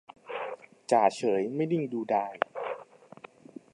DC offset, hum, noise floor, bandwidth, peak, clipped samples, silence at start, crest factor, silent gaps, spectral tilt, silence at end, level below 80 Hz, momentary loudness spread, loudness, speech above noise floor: under 0.1%; none; -52 dBFS; 11 kHz; -6 dBFS; under 0.1%; 0.25 s; 24 dB; none; -6 dB/octave; 0.9 s; -82 dBFS; 23 LU; -29 LUFS; 24 dB